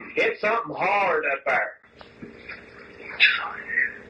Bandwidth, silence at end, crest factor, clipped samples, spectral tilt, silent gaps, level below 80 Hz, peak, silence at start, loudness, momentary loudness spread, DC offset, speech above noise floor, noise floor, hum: 9.2 kHz; 0 s; 22 dB; under 0.1%; -4 dB/octave; none; -64 dBFS; -4 dBFS; 0 s; -22 LUFS; 22 LU; under 0.1%; 20 dB; -44 dBFS; none